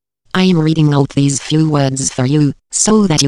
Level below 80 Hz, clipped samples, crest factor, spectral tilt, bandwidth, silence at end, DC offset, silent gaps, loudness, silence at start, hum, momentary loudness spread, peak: -42 dBFS; under 0.1%; 12 dB; -5 dB/octave; 12 kHz; 0 s; under 0.1%; none; -13 LUFS; 0.35 s; none; 4 LU; 0 dBFS